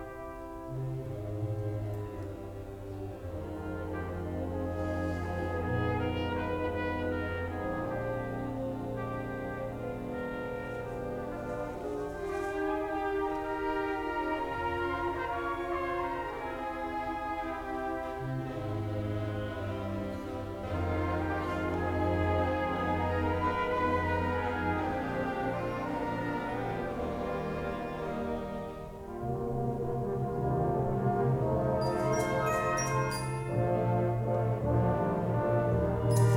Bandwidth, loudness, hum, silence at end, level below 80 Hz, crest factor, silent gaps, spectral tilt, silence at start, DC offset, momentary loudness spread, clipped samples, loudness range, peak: 17.5 kHz; -33 LUFS; none; 0 s; -48 dBFS; 16 dB; none; -7 dB/octave; 0 s; under 0.1%; 8 LU; under 0.1%; 7 LU; -16 dBFS